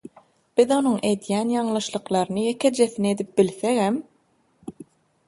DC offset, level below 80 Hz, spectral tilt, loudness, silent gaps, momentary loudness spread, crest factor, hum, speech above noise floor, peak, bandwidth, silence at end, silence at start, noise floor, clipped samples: under 0.1%; -66 dBFS; -5 dB/octave; -23 LUFS; none; 10 LU; 20 dB; none; 43 dB; -4 dBFS; 11.5 kHz; 0.45 s; 0.55 s; -64 dBFS; under 0.1%